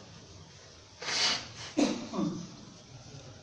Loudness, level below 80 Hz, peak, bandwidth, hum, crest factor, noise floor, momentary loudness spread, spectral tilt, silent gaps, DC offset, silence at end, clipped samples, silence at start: -32 LUFS; -64 dBFS; -16 dBFS; 10.5 kHz; none; 20 dB; -53 dBFS; 23 LU; -3 dB/octave; none; under 0.1%; 0 s; under 0.1%; 0 s